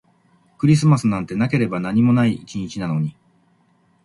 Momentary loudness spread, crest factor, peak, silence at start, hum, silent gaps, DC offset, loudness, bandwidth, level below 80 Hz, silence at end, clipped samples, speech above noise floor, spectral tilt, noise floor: 12 LU; 16 dB; -4 dBFS; 0.6 s; none; none; under 0.1%; -19 LUFS; 11.5 kHz; -54 dBFS; 0.95 s; under 0.1%; 42 dB; -7 dB/octave; -60 dBFS